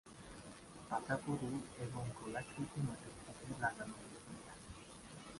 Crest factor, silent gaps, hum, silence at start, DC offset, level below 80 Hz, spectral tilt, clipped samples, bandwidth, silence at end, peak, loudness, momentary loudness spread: 22 dB; none; none; 0.05 s; under 0.1%; -66 dBFS; -5.5 dB/octave; under 0.1%; 11.5 kHz; 0 s; -24 dBFS; -46 LUFS; 14 LU